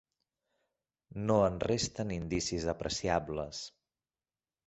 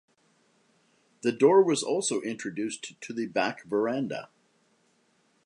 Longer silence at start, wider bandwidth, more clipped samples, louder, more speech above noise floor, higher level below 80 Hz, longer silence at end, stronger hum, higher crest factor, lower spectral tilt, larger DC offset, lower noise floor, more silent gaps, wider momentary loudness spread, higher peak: about the same, 1.15 s vs 1.25 s; second, 8.2 kHz vs 11 kHz; neither; second, -33 LUFS vs -27 LUFS; first, over 57 dB vs 42 dB; first, -54 dBFS vs -80 dBFS; second, 1 s vs 1.2 s; neither; about the same, 22 dB vs 20 dB; about the same, -4.5 dB/octave vs -4 dB/octave; neither; first, under -90 dBFS vs -68 dBFS; neither; about the same, 13 LU vs 14 LU; second, -14 dBFS vs -8 dBFS